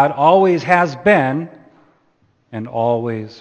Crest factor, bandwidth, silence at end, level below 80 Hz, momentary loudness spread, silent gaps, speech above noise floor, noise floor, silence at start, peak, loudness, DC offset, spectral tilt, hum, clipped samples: 16 dB; 8.8 kHz; 0.05 s; -58 dBFS; 17 LU; none; 44 dB; -59 dBFS; 0 s; 0 dBFS; -15 LUFS; under 0.1%; -7 dB/octave; none; under 0.1%